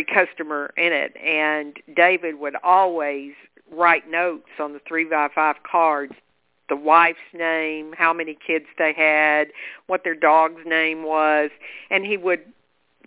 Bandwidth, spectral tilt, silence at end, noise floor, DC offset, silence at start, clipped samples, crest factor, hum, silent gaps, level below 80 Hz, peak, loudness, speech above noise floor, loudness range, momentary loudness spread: 4 kHz; -6.5 dB/octave; 0.65 s; -60 dBFS; under 0.1%; 0 s; under 0.1%; 20 dB; none; none; -70 dBFS; -2 dBFS; -20 LUFS; 39 dB; 2 LU; 11 LU